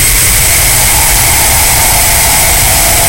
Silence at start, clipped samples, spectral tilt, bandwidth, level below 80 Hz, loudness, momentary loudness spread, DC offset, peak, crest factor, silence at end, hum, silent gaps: 0 s; 0.5%; -1 dB/octave; over 20 kHz; -16 dBFS; -5 LUFS; 0 LU; 3%; 0 dBFS; 8 dB; 0 s; none; none